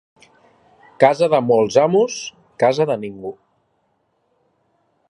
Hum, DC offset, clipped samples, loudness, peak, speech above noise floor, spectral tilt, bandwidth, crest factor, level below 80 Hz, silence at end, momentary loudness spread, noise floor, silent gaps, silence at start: none; under 0.1%; under 0.1%; -17 LUFS; 0 dBFS; 50 dB; -5 dB/octave; 11 kHz; 20 dB; -64 dBFS; 1.75 s; 17 LU; -66 dBFS; none; 1 s